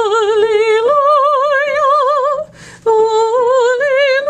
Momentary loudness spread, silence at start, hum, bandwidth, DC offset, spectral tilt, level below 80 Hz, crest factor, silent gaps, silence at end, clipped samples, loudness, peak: 5 LU; 0 s; none; 9.4 kHz; under 0.1%; -2 dB/octave; -56 dBFS; 10 dB; none; 0 s; under 0.1%; -12 LUFS; -2 dBFS